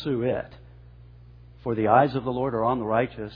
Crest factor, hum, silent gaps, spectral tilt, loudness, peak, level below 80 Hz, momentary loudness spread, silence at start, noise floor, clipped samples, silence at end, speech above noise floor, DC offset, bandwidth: 22 dB; 60 Hz at -50 dBFS; none; -10 dB/octave; -24 LUFS; -4 dBFS; -52 dBFS; 12 LU; 0 s; -48 dBFS; under 0.1%; 0 s; 24 dB; under 0.1%; 5.2 kHz